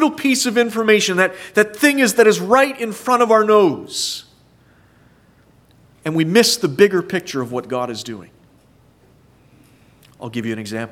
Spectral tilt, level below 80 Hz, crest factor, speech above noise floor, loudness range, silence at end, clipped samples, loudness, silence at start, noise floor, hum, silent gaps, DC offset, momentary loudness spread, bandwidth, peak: -3.5 dB/octave; -62 dBFS; 18 dB; 36 dB; 13 LU; 0.05 s; under 0.1%; -16 LUFS; 0 s; -52 dBFS; none; none; under 0.1%; 14 LU; 16.5 kHz; 0 dBFS